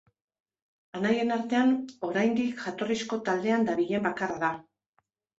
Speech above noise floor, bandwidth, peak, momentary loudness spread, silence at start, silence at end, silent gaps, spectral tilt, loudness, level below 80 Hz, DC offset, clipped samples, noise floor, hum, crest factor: 47 dB; 8 kHz; -14 dBFS; 7 LU; 0.95 s; 0.8 s; none; -5.5 dB/octave; -28 LUFS; -70 dBFS; under 0.1%; under 0.1%; -75 dBFS; none; 16 dB